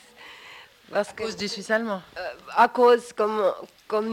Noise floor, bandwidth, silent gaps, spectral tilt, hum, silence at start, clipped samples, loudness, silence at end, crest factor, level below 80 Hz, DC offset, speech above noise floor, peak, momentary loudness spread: -47 dBFS; 16 kHz; none; -4 dB/octave; none; 0.2 s; under 0.1%; -24 LUFS; 0 s; 18 dB; -66 dBFS; under 0.1%; 23 dB; -8 dBFS; 24 LU